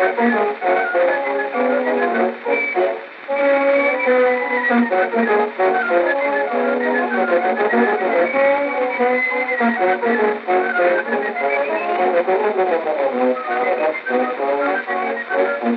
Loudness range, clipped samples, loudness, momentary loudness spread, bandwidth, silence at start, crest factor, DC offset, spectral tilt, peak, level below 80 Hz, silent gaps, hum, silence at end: 2 LU; under 0.1%; -18 LUFS; 4 LU; 5 kHz; 0 s; 14 dB; under 0.1%; -2 dB/octave; -4 dBFS; -90 dBFS; none; none; 0 s